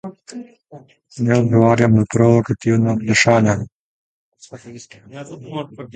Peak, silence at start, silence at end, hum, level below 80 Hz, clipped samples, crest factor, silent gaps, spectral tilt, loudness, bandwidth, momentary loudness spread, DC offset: 0 dBFS; 0.05 s; 0.1 s; none; -48 dBFS; under 0.1%; 18 dB; 3.72-4.32 s; -6 dB/octave; -15 LUFS; 9.2 kHz; 23 LU; under 0.1%